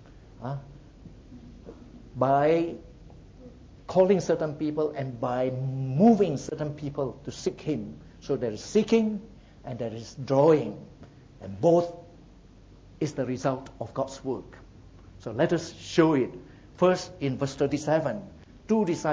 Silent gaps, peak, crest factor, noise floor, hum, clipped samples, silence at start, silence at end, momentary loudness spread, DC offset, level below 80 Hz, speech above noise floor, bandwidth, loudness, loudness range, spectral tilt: none; -8 dBFS; 20 dB; -52 dBFS; none; under 0.1%; 0.15 s; 0 s; 20 LU; under 0.1%; -54 dBFS; 26 dB; 8 kHz; -27 LUFS; 4 LU; -7 dB/octave